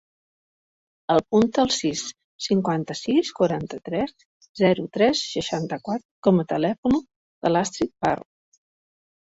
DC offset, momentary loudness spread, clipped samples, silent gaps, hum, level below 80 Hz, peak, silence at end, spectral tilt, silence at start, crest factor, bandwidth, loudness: under 0.1%; 9 LU; under 0.1%; 2.24-2.39 s, 4.25-4.41 s, 4.49-4.55 s, 6.05-6.23 s, 6.78-6.83 s, 7.16-7.41 s; none; -56 dBFS; -6 dBFS; 1.15 s; -5 dB/octave; 1.1 s; 20 dB; 8 kHz; -23 LUFS